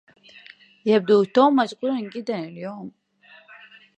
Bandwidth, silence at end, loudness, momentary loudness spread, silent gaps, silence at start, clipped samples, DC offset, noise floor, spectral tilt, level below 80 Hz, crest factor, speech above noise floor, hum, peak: 8.8 kHz; 1.1 s; -21 LUFS; 17 LU; none; 0.85 s; under 0.1%; under 0.1%; -53 dBFS; -6.5 dB/octave; -76 dBFS; 20 dB; 32 dB; none; -4 dBFS